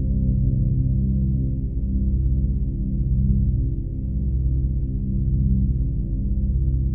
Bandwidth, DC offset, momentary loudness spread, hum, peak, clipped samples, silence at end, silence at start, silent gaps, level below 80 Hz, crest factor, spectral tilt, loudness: 0.8 kHz; 1%; 4 LU; 50 Hz at -40 dBFS; -8 dBFS; under 0.1%; 0 s; 0 s; none; -22 dBFS; 12 dB; -15 dB/octave; -23 LUFS